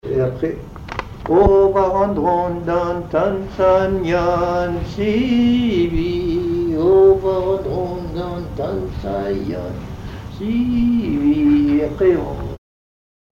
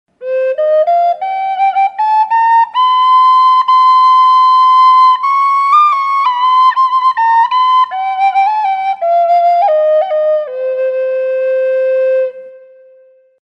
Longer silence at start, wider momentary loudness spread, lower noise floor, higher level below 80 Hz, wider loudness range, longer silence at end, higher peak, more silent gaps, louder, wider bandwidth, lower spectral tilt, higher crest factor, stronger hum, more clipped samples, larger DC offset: second, 0.05 s vs 0.2 s; first, 14 LU vs 8 LU; first, under -90 dBFS vs -45 dBFS; first, -34 dBFS vs -78 dBFS; about the same, 6 LU vs 5 LU; about the same, 0.75 s vs 0.85 s; about the same, 0 dBFS vs 0 dBFS; neither; second, -18 LUFS vs -10 LUFS; about the same, 7.2 kHz vs 7.6 kHz; first, -8 dB/octave vs 0 dB/octave; first, 16 dB vs 10 dB; neither; neither; neither